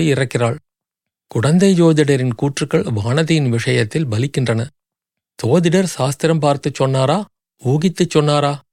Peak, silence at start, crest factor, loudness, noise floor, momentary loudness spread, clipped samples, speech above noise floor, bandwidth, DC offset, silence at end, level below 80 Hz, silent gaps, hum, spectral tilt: -2 dBFS; 0 s; 14 dB; -16 LUFS; -83 dBFS; 8 LU; under 0.1%; 68 dB; 14.5 kHz; under 0.1%; 0.15 s; -56 dBFS; none; none; -6 dB/octave